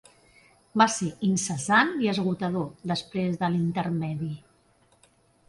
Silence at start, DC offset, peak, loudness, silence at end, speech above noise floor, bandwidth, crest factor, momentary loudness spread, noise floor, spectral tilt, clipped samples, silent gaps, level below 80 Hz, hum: 0.75 s; under 0.1%; -8 dBFS; -26 LUFS; 1.1 s; 37 dB; 11.5 kHz; 20 dB; 10 LU; -63 dBFS; -4.5 dB/octave; under 0.1%; none; -64 dBFS; none